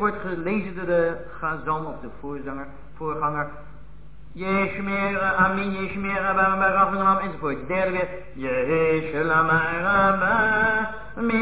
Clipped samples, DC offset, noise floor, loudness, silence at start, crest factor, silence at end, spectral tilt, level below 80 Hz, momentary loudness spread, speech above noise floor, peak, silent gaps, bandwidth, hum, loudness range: under 0.1%; 1%; -45 dBFS; -23 LUFS; 0 s; 16 dB; 0 s; -10 dB/octave; -46 dBFS; 14 LU; 22 dB; -8 dBFS; none; 4 kHz; none; 8 LU